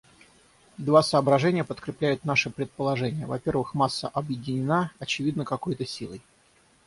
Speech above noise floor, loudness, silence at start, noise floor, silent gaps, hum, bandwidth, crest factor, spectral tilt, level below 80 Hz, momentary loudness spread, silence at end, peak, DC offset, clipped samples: 35 dB; -26 LUFS; 0.8 s; -61 dBFS; none; none; 11.5 kHz; 22 dB; -6 dB/octave; -60 dBFS; 11 LU; 0.65 s; -6 dBFS; under 0.1%; under 0.1%